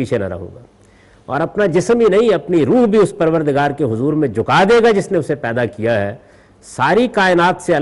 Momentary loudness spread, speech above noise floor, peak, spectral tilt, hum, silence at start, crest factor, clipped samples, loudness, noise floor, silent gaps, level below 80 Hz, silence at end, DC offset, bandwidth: 9 LU; 33 dB; -4 dBFS; -6 dB/octave; none; 0 s; 10 dB; under 0.1%; -15 LUFS; -47 dBFS; none; -48 dBFS; 0 s; under 0.1%; 11.5 kHz